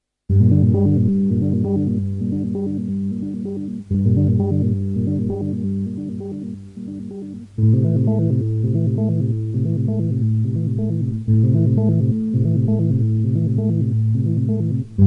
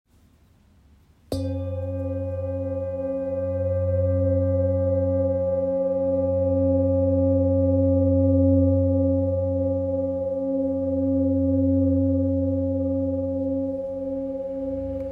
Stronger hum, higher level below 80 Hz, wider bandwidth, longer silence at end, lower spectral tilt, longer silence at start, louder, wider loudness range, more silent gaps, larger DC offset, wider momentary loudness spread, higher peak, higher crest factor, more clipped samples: neither; first, -46 dBFS vs -52 dBFS; second, 1.4 kHz vs 5.2 kHz; about the same, 0 s vs 0 s; about the same, -12 dB/octave vs -11.5 dB/octave; second, 0.3 s vs 1.3 s; first, -19 LUFS vs -23 LUFS; about the same, 4 LU vs 6 LU; neither; neither; about the same, 11 LU vs 9 LU; first, -2 dBFS vs -10 dBFS; about the same, 16 dB vs 12 dB; neither